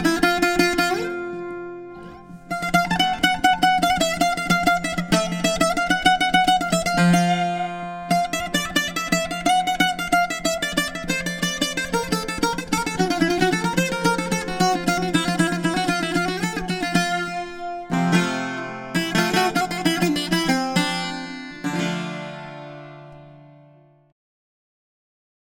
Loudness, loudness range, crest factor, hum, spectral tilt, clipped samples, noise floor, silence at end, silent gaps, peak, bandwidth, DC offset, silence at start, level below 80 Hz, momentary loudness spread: -21 LUFS; 5 LU; 20 dB; none; -4 dB/octave; under 0.1%; -52 dBFS; 2.05 s; none; -2 dBFS; 18 kHz; under 0.1%; 0 s; -46 dBFS; 13 LU